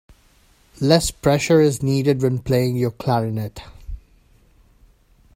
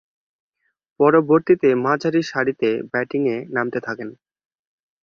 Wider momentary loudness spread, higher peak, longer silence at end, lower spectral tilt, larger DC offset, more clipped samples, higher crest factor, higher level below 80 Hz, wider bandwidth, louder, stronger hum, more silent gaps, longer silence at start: first, 23 LU vs 11 LU; about the same, 0 dBFS vs -2 dBFS; first, 1.4 s vs 0.9 s; about the same, -6 dB/octave vs -7 dB/octave; neither; neither; about the same, 22 dB vs 18 dB; first, -42 dBFS vs -64 dBFS; first, 16 kHz vs 7 kHz; about the same, -19 LUFS vs -19 LUFS; neither; neither; second, 0.8 s vs 1 s